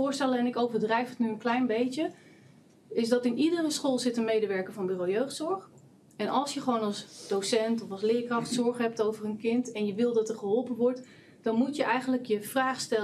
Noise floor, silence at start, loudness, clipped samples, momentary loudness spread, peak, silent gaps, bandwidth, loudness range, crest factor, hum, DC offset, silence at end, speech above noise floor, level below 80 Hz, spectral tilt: -57 dBFS; 0 s; -29 LUFS; under 0.1%; 6 LU; -12 dBFS; none; 14 kHz; 2 LU; 18 dB; none; under 0.1%; 0 s; 28 dB; -84 dBFS; -4.5 dB/octave